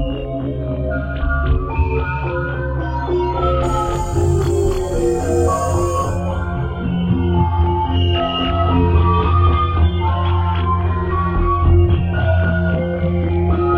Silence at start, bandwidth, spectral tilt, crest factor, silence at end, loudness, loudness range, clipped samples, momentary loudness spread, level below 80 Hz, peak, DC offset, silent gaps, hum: 0 s; 9.4 kHz; -7 dB/octave; 14 dB; 0 s; -18 LUFS; 3 LU; under 0.1%; 7 LU; -22 dBFS; -4 dBFS; under 0.1%; none; none